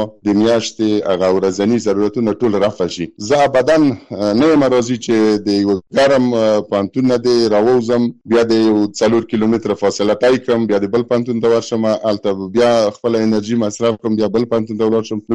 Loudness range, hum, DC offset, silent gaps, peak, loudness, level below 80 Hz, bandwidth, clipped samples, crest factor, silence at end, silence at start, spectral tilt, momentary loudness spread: 2 LU; none; under 0.1%; none; -6 dBFS; -15 LUFS; -50 dBFS; 11 kHz; under 0.1%; 10 dB; 0 s; 0 s; -5.5 dB/octave; 5 LU